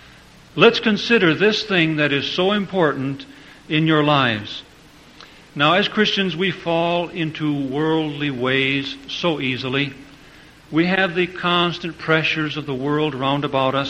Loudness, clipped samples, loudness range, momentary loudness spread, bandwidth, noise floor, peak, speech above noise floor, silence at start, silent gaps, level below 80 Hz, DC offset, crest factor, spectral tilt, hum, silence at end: -19 LUFS; under 0.1%; 4 LU; 9 LU; 9.6 kHz; -46 dBFS; 0 dBFS; 27 dB; 0.55 s; none; -54 dBFS; under 0.1%; 20 dB; -6 dB/octave; none; 0 s